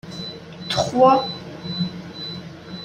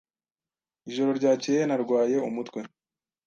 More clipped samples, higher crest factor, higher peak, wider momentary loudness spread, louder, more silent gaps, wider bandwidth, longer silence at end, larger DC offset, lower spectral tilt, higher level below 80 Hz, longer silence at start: neither; about the same, 20 dB vs 16 dB; first, -2 dBFS vs -12 dBFS; first, 19 LU vs 14 LU; first, -21 LUFS vs -26 LUFS; neither; first, 12.5 kHz vs 7.6 kHz; second, 0 s vs 0.6 s; neither; about the same, -5 dB/octave vs -5.5 dB/octave; first, -56 dBFS vs -78 dBFS; second, 0.05 s vs 0.85 s